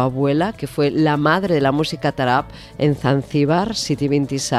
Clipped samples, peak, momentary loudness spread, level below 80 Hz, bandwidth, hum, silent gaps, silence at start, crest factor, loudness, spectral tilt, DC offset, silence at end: under 0.1%; -2 dBFS; 4 LU; -46 dBFS; 13.5 kHz; none; none; 0 s; 16 dB; -19 LUFS; -5.5 dB/octave; under 0.1%; 0 s